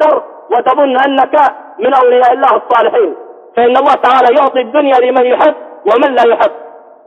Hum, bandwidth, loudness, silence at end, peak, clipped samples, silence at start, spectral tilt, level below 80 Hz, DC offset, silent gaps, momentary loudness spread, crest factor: none; 7 kHz; -10 LUFS; 0.35 s; 0 dBFS; under 0.1%; 0 s; -4.5 dB/octave; -60 dBFS; under 0.1%; none; 7 LU; 10 dB